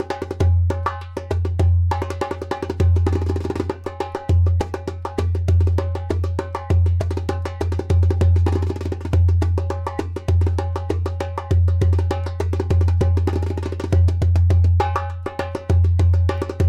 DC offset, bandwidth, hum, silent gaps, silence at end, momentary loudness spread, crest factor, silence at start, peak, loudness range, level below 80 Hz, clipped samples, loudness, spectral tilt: under 0.1%; 7.2 kHz; none; none; 0 s; 9 LU; 12 dB; 0 s; -8 dBFS; 3 LU; -28 dBFS; under 0.1%; -20 LUFS; -8 dB/octave